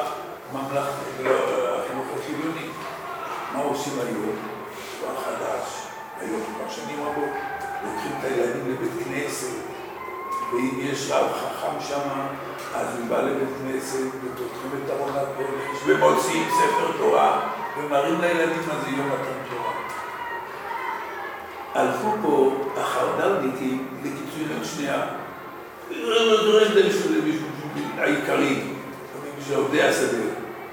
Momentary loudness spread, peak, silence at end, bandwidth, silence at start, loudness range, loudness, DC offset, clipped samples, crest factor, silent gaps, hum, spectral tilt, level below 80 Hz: 13 LU; -6 dBFS; 0 s; 19.5 kHz; 0 s; 8 LU; -25 LUFS; under 0.1%; under 0.1%; 20 dB; none; none; -4 dB/octave; -64 dBFS